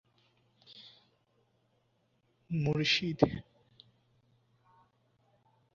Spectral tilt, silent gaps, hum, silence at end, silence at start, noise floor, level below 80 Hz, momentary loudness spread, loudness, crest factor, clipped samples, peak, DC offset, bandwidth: -4 dB/octave; none; none; 2.35 s; 0.7 s; -75 dBFS; -62 dBFS; 25 LU; -31 LUFS; 30 dB; under 0.1%; -8 dBFS; under 0.1%; 7.2 kHz